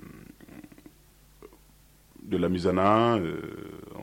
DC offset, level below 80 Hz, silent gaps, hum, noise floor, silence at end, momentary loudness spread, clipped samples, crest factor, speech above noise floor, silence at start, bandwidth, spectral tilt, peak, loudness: under 0.1%; -56 dBFS; none; none; -57 dBFS; 0 s; 26 LU; under 0.1%; 22 dB; 33 dB; 0.05 s; 17 kHz; -7 dB/octave; -8 dBFS; -26 LUFS